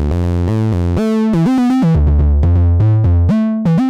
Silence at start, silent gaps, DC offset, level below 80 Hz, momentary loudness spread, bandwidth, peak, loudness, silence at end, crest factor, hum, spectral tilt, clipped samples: 0 s; none; under 0.1%; -20 dBFS; 4 LU; 8 kHz; -4 dBFS; -13 LUFS; 0 s; 8 dB; none; -9.5 dB/octave; under 0.1%